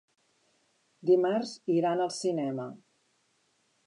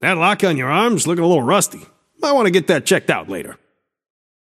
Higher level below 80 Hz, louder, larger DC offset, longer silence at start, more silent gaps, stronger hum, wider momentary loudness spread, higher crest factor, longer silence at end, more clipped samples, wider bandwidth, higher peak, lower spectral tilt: second, -88 dBFS vs -64 dBFS; second, -29 LUFS vs -16 LUFS; neither; first, 1.05 s vs 0 s; neither; neither; about the same, 11 LU vs 9 LU; about the same, 18 dB vs 18 dB; about the same, 1.1 s vs 1 s; neither; second, 11 kHz vs 15.5 kHz; second, -14 dBFS vs 0 dBFS; first, -6 dB/octave vs -4 dB/octave